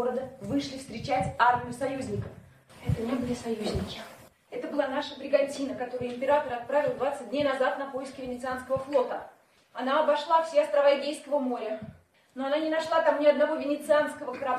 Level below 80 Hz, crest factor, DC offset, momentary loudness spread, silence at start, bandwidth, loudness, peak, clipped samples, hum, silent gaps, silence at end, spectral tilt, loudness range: -54 dBFS; 20 dB; under 0.1%; 13 LU; 0 s; 13.5 kHz; -28 LUFS; -8 dBFS; under 0.1%; none; none; 0 s; -5.5 dB/octave; 4 LU